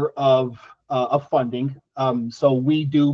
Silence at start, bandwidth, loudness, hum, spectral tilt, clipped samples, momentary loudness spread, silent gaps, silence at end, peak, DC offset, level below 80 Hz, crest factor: 0 s; 7.4 kHz; -21 LUFS; none; -8 dB/octave; under 0.1%; 9 LU; none; 0 s; -4 dBFS; under 0.1%; -64 dBFS; 16 dB